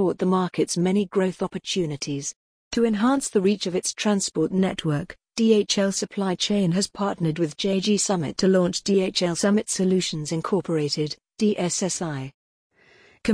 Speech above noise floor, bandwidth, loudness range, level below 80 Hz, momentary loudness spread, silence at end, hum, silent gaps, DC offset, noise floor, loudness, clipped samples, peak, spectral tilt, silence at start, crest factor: 33 dB; 10.5 kHz; 2 LU; -58 dBFS; 8 LU; 0 s; none; 2.36-2.71 s, 12.34-12.70 s; under 0.1%; -56 dBFS; -23 LUFS; under 0.1%; -6 dBFS; -4.5 dB/octave; 0 s; 16 dB